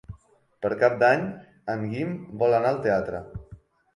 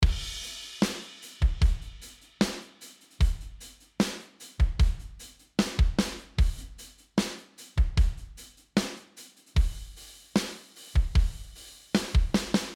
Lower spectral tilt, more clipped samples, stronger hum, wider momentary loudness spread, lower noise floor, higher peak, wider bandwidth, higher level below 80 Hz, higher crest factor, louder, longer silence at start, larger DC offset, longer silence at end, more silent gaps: first, -7.5 dB/octave vs -5 dB/octave; neither; neither; second, 16 LU vs 20 LU; first, -57 dBFS vs -52 dBFS; about the same, -6 dBFS vs -8 dBFS; second, 11 kHz vs 15.5 kHz; second, -54 dBFS vs -30 dBFS; about the same, 20 dB vs 20 dB; first, -25 LUFS vs -30 LUFS; about the same, 0.1 s vs 0 s; neither; first, 0.4 s vs 0 s; neither